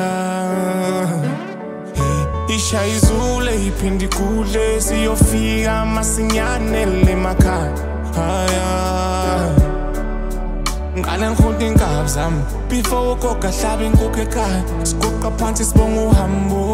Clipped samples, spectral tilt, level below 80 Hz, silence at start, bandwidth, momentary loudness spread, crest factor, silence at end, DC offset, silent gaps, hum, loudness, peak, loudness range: under 0.1%; -5 dB/octave; -20 dBFS; 0 s; 16 kHz; 7 LU; 16 dB; 0 s; under 0.1%; none; none; -18 LUFS; 0 dBFS; 2 LU